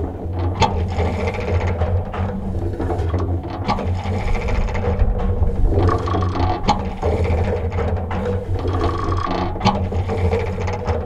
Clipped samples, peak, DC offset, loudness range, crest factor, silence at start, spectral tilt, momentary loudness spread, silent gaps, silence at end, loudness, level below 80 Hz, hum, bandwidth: under 0.1%; -2 dBFS; under 0.1%; 2 LU; 18 dB; 0 s; -7.5 dB/octave; 5 LU; none; 0 s; -21 LUFS; -24 dBFS; none; 7.8 kHz